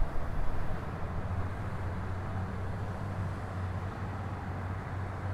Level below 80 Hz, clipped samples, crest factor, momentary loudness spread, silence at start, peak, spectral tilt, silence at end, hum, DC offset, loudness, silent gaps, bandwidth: -40 dBFS; under 0.1%; 16 dB; 2 LU; 0 s; -18 dBFS; -8 dB/octave; 0 s; none; under 0.1%; -38 LUFS; none; 10.5 kHz